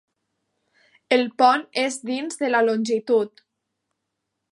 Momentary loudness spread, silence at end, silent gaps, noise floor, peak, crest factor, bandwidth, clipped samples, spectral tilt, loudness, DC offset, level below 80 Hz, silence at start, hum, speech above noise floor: 9 LU; 1.25 s; none; -80 dBFS; -4 dBFS; 20 dB; 11.5 kHz; under 0.1%; -3.5 dB/octave; -21 LUFS; under 0.1%; -82 dBFS; 1.1 s; none; 59 dB